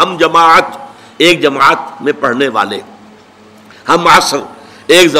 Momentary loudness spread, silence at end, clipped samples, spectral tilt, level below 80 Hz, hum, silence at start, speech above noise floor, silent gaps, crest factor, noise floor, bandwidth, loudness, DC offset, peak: 17 LU; 0 s; 0.2%; -3 dB/octave; -46 dBFS; none; 0 s; 30 dB; none; 10 dB; -39 dBFS; 16.5 kHz; -9 LUFS; 0.4%; 0 dBFS